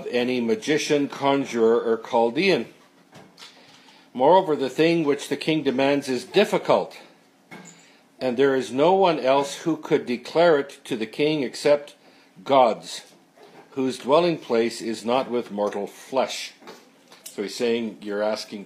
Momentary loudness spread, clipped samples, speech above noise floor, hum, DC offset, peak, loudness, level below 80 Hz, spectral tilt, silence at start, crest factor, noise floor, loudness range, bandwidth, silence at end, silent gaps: 13 LU; under 0.1%; 30 dB; none; under 0.1%; -4 dBFS; -22 LUFS; -78 dBFS; -5 dB/octave; 0 s; 20 dB; -52 dBFS; 3 LU; 15.5 kHz; 0 s; none